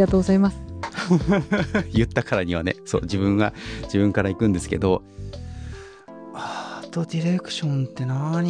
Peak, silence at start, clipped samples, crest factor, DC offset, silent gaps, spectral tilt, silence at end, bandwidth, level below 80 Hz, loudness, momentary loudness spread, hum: -6 dBFS; 0 s; under 0.1%; 16 dB; under 0.1%; none; -6.5 dB/octave; 0 s; 10 kHz; -40 dBFS; -23 LUFS; 16 LU; none